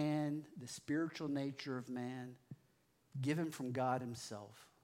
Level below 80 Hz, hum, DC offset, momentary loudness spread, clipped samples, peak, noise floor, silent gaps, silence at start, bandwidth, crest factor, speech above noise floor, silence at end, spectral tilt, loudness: -86 dBFS; none; under 0.1%; 14 LU; under 0.1%; -24 dBFS; -75 dBFS; none; 0 s; 16 kHz; 18 dB; 34 dB; 0.2 s; -6 dB/octave; -42 LUFS